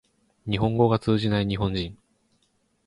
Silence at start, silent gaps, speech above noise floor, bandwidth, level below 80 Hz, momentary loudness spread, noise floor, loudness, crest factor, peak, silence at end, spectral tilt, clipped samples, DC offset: 0.45 s; none; 46 dB; 11 kHz; -46 dBFS; 12 LU; -69 dBFS; -24 LUFS; 18 dB; -8 dBFS; 0.95 s; -8 dB/octave; under 0.1%; under 0.1%